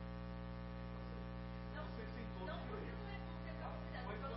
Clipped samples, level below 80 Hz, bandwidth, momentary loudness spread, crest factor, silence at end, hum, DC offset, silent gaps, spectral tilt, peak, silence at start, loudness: under 0.1%; -52 dBFS; 5.6 kHz; 3 LU; 12 dB; 0 s; 60 Hz at -50 dBFS; under 0.1%; none; -6 dB/octave; -34 dBFS; 0 s; -49 LUFS